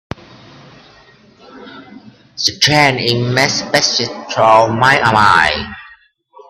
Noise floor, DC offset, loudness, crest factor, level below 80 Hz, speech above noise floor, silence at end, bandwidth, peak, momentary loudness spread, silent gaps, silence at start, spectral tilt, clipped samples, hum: -46 dBFS; under 0.1%; -12 LUFS; 16 dB; -46 dBFS; 33 dB; 0.65 s; 15.5 kHz; 0 dBFS; 19 LU; none; 1.55 s; -3.5 dB/octave; under 0.1%; none